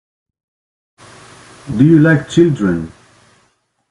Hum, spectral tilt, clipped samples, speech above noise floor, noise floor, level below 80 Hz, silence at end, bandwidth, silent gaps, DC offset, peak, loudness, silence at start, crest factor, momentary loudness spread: none; -7.5 dB/octave; under 0.1%; 49 dB; -60 dBFS; -46 dBFS; 1 s; 11 kHz; none; under 0.1%; 0 dBFS; -12 LUFS; 1.65 s; 16 dB; 14 LU